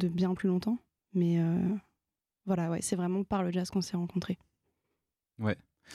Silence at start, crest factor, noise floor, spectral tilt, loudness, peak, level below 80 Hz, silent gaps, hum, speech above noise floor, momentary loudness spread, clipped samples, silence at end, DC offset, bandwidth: 0 s; 16 dB; -89 dBFS; -6.5 dB/octave; -32 LUFS; -16 dBFS; -64 dBFS; none; none; 58 dB; 10 LU; under 0.1%; 0 s; under 0.1%; 13 kHz